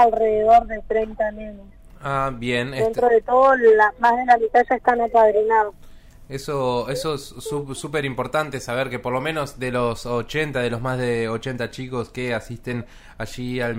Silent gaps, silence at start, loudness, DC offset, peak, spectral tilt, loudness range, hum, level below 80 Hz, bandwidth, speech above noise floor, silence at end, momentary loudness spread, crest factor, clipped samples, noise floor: none; 0 s; -21 LUFS; under 0.1%; -2 dBFS; -5.5 dB/octave; 9 LU; none; -44 dBFS; 16 kHz; 22 dB; 0 s; 14 LU; 18 dB; under 0.1%; -42 dBFS